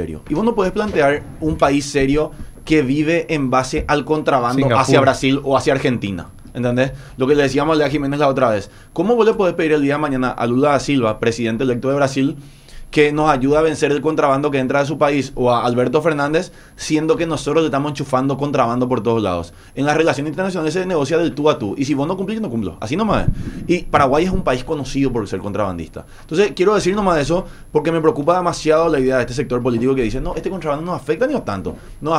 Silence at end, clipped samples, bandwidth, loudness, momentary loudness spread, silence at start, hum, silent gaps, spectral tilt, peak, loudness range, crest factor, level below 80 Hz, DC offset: 0 s; under 0.1%; 13 kHz; -17 LUFS; 8 LU; 0 s; none; none; -6 dB/octave; 0 dBFS; 3 LU; 16 dB; -36 dBFS; under 0.1%